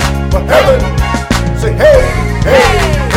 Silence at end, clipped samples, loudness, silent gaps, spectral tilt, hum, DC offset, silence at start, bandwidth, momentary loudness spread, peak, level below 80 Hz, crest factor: 0 s; under 0.1%; -10 LUFS; none; -5.5 dB/octave; none; under 0.1%; 0 s; 16.5 kHz; 7 LU; 0 dBFS; -16 dBFS; 10 dB